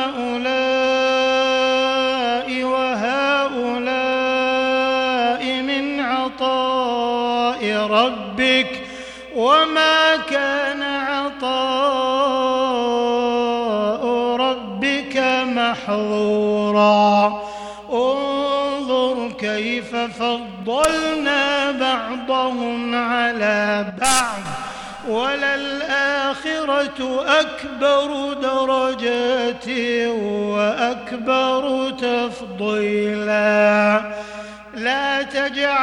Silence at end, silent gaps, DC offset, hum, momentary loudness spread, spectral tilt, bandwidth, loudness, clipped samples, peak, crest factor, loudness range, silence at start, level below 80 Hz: 0 s; none; under 0.1%; none; 7 LU; -3.5 dB/octave; 16.5 kHz; -19 LUFS; under 0.1%; -2 dBFS; 16 dB; 3 LU; 0 s; -54 dBFS